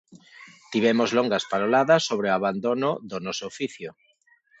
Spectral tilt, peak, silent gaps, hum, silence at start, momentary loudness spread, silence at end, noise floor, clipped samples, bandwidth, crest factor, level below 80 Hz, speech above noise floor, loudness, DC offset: -4.5 dB/octave; -6 dBFS; none; none; 0.15 s; 12 LU; 0.7 s; -63 dBFS; under 0.1%; 8.2 kHz; 18 dB; -70 dBFS; 39 dB; -24 LUFS; under 0.1%